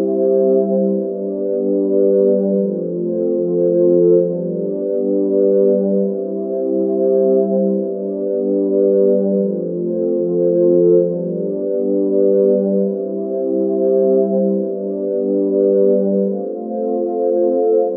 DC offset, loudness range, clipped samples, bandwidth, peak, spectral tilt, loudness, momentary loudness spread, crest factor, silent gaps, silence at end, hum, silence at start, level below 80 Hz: under 0.1%; 1 LU; under 0.1%; 1.7 kHz; -2 dBFS; -12 dB/octave; -16 LUFS; 7 LU; 12 dB; none; 0 s; none; 0 s; -72 dBFS